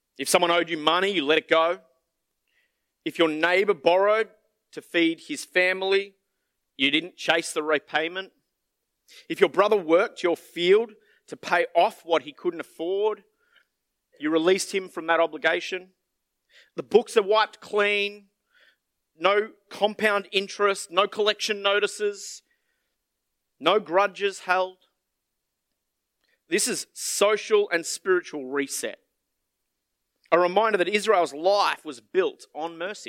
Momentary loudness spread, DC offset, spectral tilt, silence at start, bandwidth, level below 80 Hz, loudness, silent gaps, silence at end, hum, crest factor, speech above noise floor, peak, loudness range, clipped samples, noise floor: 12 LU; under 0.1%; -2.5 dB/octave; 0.2 s; 16.5 kHz; -82 dBFS; -24 LUFS; none; 0.05 s; none; 22 dB; 57 dB; -2 dBFS; 4 LU; under 0.1%; -81 dBFS